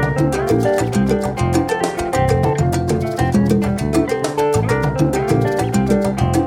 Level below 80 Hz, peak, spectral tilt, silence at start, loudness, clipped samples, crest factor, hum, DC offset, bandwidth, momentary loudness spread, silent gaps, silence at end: -32 dBFS; -2 dBFS; -6.5 dB/octave; 0 s; -17 LUFS; under 0.1%; 14 dB; none; under 0.1%; 17 kHz; 2 LU; none; 0 s